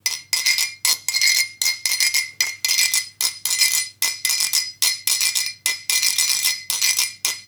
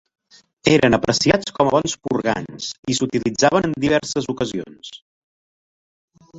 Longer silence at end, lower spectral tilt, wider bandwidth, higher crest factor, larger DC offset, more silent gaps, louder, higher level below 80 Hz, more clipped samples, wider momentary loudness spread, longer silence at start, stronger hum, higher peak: about the same, 0.05 s vs 0 s; second, 4.5 dB/octave vs -4.5 dB/octave; first, over 20 kHz vs 8.2 kHz; about the same, 20 dB vs 20 dB; neither; second, none vs 2.79-2.83 s, 5.02-6.08 s; about the same, -18 LUFS vs -19 LUFS; second, -74 dBFS vs -48 dBFS; neither; second, 5 LU vs 13 LU; second, 0.05 s vs 0.65 s; neither; about the same, -2 dBFS vs -2 dBFS